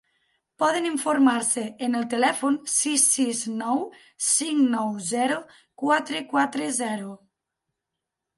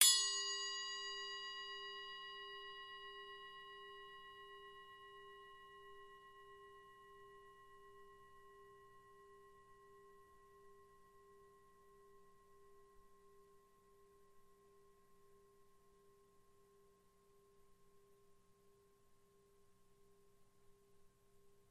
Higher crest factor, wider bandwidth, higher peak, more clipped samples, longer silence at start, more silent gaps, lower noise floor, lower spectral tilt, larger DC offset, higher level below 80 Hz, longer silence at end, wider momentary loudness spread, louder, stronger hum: second, 20 dB vs 36 dB; about the same, 12 kHz vs 13 kHz; first, -6 dBFS vs -12 dBFS; neither; first, 0.6 s vs 0 s; neither; first, -84 dBFS vs -72 dBFS; first, -2 dB/octave vs 2.5 dB/octave; neither; about the same, -76 dBFS vs -78 dBFS; first, 1.2 s vs 0.15 s; second, 8 LU vs 24 LU; first, -23 LUFS vs -43 LUFS; neither